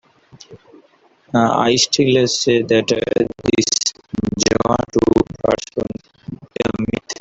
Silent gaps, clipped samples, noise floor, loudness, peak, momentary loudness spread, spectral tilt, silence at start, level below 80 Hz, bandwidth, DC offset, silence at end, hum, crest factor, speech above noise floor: none; under 0.1%; -53 dBFS; -17 LUFS; -2 dBFS; 11 LU; -4 dB/octave; 0.5 s; -44 dBFS; 8.2 kHz; under 0.1%; 0.1 s; none; 18 dB; 38 dB